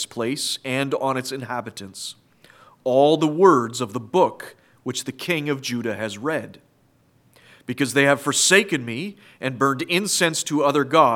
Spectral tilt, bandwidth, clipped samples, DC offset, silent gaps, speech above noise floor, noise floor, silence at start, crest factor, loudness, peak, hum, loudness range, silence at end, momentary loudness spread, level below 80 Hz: -3.5 dB/octave; 17.5 kHz; under 0.1%; under 0.1%; none; 39 dB; -60 dBFS; 0 s; 20 dB; -21 LUFS; -2 dBFS; none; 7 LU; 0 s; 17 LU; -74 dBFS